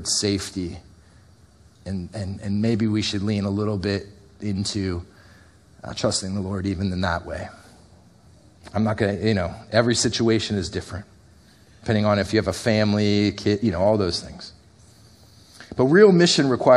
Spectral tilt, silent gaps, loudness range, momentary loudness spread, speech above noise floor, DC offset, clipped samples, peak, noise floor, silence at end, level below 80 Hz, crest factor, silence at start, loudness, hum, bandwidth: -5 dB/octave; none; 6 LU; 15 LU; 31 dB; under 0.1%; under 0.1%; -2 dBFS; -52 dBFS; 0 s; -48 dBFS; 20 dB; 0 s; -22 LUFS; none; 12.5 kHz